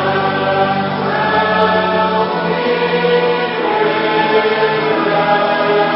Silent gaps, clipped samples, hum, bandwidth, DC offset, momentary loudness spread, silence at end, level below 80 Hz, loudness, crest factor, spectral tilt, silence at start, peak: none; under 0.1%; none; 5.8 kHz; under 0.1%; 3 LU; 0 s; -54 dBFS; -14 LUFS; 14 dB; -9 dB/octave; 0 s; 0 dBFS